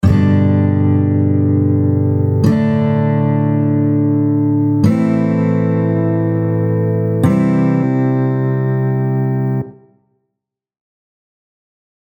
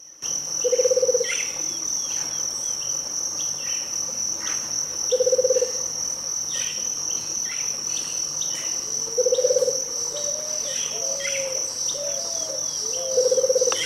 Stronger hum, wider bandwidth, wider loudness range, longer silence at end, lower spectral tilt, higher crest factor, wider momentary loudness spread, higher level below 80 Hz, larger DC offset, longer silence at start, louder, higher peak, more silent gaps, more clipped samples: neither; second, 9.2 kHz vs 16 kHz; first, 5 LU vs 1 LU; first, 2.3 s vs 0 s; first, -10 dB/octave vs 0.5 dB/octave; about the same, 14 dB vs 18 dB; about the same, 3 LU vs 5 LU; first, -42 dBFS vs -64 dBFS; neither; about the same, 0.05 s vs 0 s; first, -14 LUFS vs -23 LUFS; first, 0 dBFS vs -8 dBFS; neither; neither